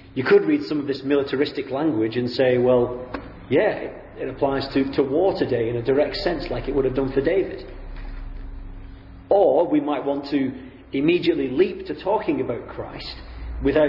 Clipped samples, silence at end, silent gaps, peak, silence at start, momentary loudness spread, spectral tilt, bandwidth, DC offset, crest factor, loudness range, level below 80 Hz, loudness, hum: under 0.1%; 0 s; none; -6 dBFS; 0 s; 19 LU; -8.5 dB/octave; 5.8 kHz; under 0.1%; 16 dB; 3 LU; -40 dBFS; -22 LUFS; none